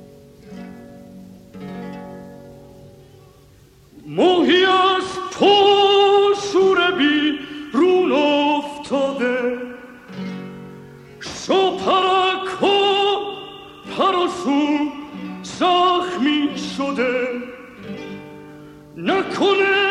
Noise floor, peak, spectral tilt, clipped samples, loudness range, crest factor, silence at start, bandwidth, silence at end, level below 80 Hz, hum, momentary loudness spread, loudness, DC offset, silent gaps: -49 dBFS; -4 dBFS; -4 dB/octave; under 0.1%; 9 LU; 16 dB; 0 s; 11 kHz; 0 s; -58 dBFS; none; 22 LU; -17 LUFS; under 0.1%; none